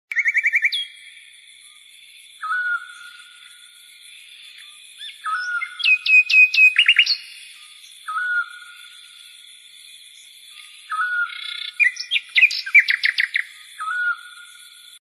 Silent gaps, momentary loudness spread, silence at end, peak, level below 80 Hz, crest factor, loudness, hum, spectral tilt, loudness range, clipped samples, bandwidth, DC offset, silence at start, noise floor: none; 26 LU; 0.55 s; -2 dBFS; -80 dBFS; 20 dB; -17 LUFS; none; 5.5 dB/octave; 16 LU; under 0.1%; 13 kHz; under 0.1%; 0.1 s; -47 dBFS